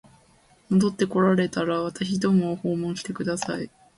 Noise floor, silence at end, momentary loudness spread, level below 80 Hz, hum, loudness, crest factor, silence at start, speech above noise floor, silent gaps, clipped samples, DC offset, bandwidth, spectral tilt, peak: -58 dBFS; 0.3 s; 8 LU; -60 dBFS; none; -25 LUFS; 16 dB; 0.7 s; 35 dB; none; under 0.1%; under 0.1%; 11.5 kHz; -6 dB/octave; -8 dBFS